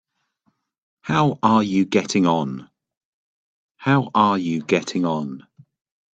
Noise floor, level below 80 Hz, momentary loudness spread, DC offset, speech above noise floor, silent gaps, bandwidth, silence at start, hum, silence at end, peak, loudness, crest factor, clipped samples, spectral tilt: -69 dBFS; -62 dBFS; 13 LU; under 0.1%; 50 dB; 2.97-3.75 s; 8.6 kHz; 1.05 s; none; 0.75 s; -2 dBFS; -20 LUFS; 20 dB; under 0.1%; -6 dB/octave